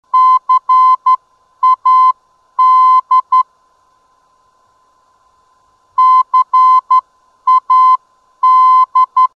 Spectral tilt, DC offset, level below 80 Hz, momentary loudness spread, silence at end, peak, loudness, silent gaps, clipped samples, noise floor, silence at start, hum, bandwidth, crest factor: 1.5 dB/octave; under 0.1%; -74 dBFS; 7 LU; 0.1 s; -4 dBFS; -10 LUFS; none; under 0.1%; -54 dBFS; 0.15 s; none; 6.6 kHz; 8 dB